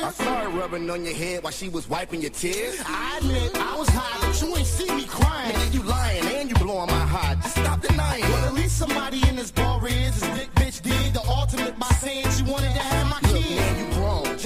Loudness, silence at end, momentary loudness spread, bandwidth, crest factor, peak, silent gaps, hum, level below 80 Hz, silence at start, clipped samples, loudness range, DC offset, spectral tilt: -24 LUFS; 0 s; 6 LU; 16 kHz; 16 dB; -6 dBFS; none; none; -28 dBFS; 0 s; under 0.1%; 3 LU; under 0.1%; -4.5 dB/octave